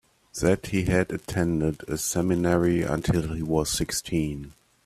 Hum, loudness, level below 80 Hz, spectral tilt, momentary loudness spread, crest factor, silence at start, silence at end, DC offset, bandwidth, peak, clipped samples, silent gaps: none; -26 LUFS; -44 dBFS; -5 dB/octave; 6 LU; 18 dB; 0.35 s; 0.35 s; under 0.1%; 15.5 kHz; -8 dBFS; under 0.1%; none